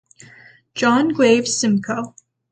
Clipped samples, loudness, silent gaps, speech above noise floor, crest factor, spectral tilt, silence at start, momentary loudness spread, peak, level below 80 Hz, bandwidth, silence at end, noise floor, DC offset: under 0.1%; -17 LUFS; none; 30 dB; 16 dB; -4 dB/octave; 0.75 s; 14 LU; -2 dBFS; -62 dBFS; 9.4 kHz; 0.4 s; -47 dBFS; under 0.1%